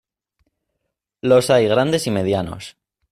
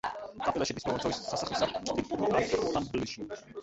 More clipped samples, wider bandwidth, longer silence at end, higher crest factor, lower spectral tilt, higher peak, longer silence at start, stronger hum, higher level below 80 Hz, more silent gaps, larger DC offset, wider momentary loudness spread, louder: neither; first, 15 kHz vs 8.4 kHz; first, 0.4 s vs 0 s; about the same, 16 dB vs 18 dB; about the same, -5.5 dB/octave vs -4.5 dB/octave; first, -4 dBFS vs -14 dBFS; first, 1.25 s vs 0.05 s; neither; about the same, -54 dBFS vs -56 dBFS; neither; neither; first, 17 LU vs 9 LU; first, -17 LUFS vs -32 LUFS